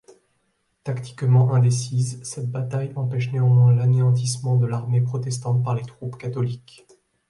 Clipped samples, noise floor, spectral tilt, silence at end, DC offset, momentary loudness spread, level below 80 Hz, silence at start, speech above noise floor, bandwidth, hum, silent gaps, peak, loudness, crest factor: under 0.1%; -70 dBFS; -7 dB/octave; 0.7 s; under 0.1%; 14 LU; -60 dBFS; 0.85 s; 49 dB; 11.5 kHz; none; none; -8 dBFS; -22 LUFS; 14 dB